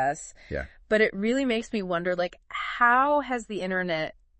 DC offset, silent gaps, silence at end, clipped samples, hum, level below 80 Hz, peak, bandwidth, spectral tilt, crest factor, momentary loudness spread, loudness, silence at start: under 0.1%; none; 0.3 s; under 0.1%; none; -52 dBFS; -8 dBFS; 8.8 kHz; -5 dB/octave; 20 dB; 14 LU; -26 LUFS; 0 s